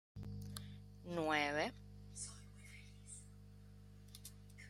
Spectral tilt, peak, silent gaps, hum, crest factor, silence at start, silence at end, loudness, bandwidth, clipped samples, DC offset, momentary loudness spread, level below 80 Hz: -4 dB/octave; -22 dBFS; none; 50 Hz at -55 dBFS; 26 dB; 0.15 s; 0 s; -43 LUFS; 16 kHz; under 0.1%; under 0.1%; 23 LU; -62 dBFS